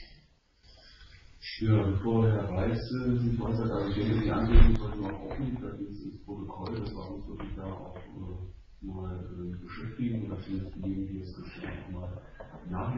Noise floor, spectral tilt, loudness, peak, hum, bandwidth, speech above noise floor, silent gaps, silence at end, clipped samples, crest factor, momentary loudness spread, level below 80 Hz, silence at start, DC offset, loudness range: -62 dBFS; -7.5 dB/octave; -32 LUFS; -6 dBFS; none; 5.8 kHz; 33 dB; none; 0 s; under 0.1%; 24 dB; 17 LU; -34 dBFS; 0 s; under 0.1%; 12 LU